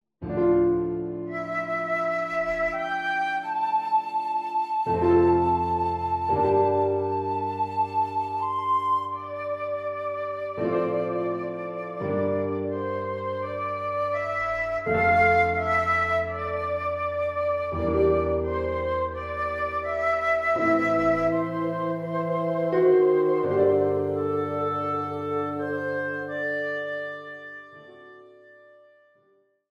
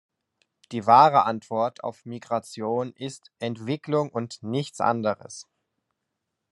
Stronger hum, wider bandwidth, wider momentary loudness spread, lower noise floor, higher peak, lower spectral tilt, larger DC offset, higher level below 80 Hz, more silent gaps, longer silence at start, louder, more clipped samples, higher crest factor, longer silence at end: neither; second, 7.8 kHz vs 12 kHz; second, 9 LU vs 19 LU; second, -65 dBFS vs -82 dBFS; second, -10 dBFS vs -4 dBFS; first, -8 dB/octave vs -6 dB/octave; neither; first, -50 dBFS vs -76 dBFS; neither; second, 0.2 s vs 0.7 s; about the same, -25 LUFS vs -24 LUFS; neither; second, 16 dB vs 22 dB; first, 1.4 s vs 1.1 s